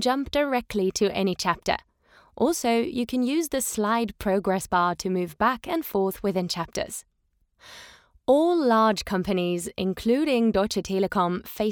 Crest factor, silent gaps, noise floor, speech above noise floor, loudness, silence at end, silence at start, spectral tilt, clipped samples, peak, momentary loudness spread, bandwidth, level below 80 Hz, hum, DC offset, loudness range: 18 dB; none; -70 dBFS; 46 dB; -25 LUFS; 0 s; 0 s; -4.5 dB/octave; under 0.1%; -6 dBFS; 8 LU; over 20 kHz; -52 dBFS; none; under 0.1%; 4 LU